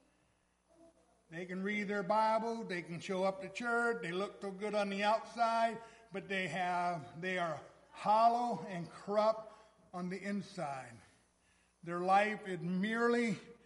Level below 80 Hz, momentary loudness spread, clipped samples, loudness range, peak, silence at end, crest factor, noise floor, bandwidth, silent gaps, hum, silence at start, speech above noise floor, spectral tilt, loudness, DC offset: -78 dBFS; 15 LU; under 0.1%; 3 LU; -18 dBFS; 0.1 s; 20 dB; -75 dBFS; 11.5 kHz; none; none; 1.3 s; 39 dB; -5.5 dB/octave; -36 LUFS; under 0.1%